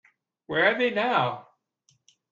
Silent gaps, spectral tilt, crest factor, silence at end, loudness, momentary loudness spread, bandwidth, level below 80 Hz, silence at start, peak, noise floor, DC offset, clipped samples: none; -6 dB/octave; 18 dB; 0.9 s; -24 LUFS; 8 LU; 7.4 kHz; -70 dBFS; 0.5 s; -8 dBFS; -69 dBFS; under 0.1%; under 0.1%